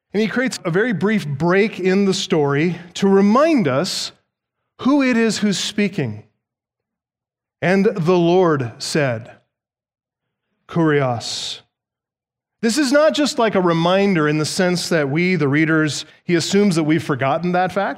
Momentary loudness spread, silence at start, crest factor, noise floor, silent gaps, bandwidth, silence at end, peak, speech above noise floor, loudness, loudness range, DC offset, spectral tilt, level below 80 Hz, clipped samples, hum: 8 LU; 0.15 s; 16 dB; -88 dBFS; none; 15.5 kHz; 0 s; -2 dBFS; 71 dB; -18 LUFS; 5 LU; under 0.1%; -5.5 dB/octave; -62 dBFS; under 0.1%; none